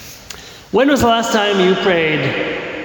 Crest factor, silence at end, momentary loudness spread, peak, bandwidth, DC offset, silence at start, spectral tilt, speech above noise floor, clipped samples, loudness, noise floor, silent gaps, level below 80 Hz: 12 dB; 0 s; 19 LU; -4 dBFS; 19 kHz; under 0.1%; 0 s; -4.5 dB/octave; 21 dB; under 0.1%; -15 LUFS; -35 dBFS; none; -42 dBFS